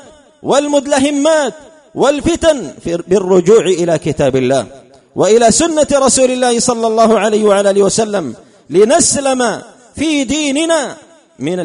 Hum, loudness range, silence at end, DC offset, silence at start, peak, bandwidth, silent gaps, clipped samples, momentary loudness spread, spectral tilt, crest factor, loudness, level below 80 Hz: none; 3 LU; 0 s; under 0.1%; 0.45 s; 0 dBFS; 11 kHz; none; under 0.1%; 11 LU; -4 dB/octave; 12 dB; -12 LUFS; -42 dBFS